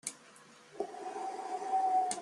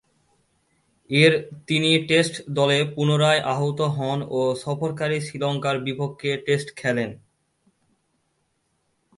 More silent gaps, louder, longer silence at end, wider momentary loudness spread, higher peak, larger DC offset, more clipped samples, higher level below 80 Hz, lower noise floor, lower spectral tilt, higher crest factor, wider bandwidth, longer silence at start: neither; second, -36 LUFS vs -22 LUFS; second, 0 s vs 2 s; first, 25 LU vs 9 LU; second, -20 dBFS vs -4 dBFS; neither; neither; second, -86 dBFS vs -64 dBFS; second, -58 dBFS vs -71 dBFS; second, -1.5 dB/octave vs -5 dB/octave; about the same, 16 dB vs 20 dB; about the same, 12.5 kHz vs 11.5 kHz; second, 0.05 s vs 1.1 s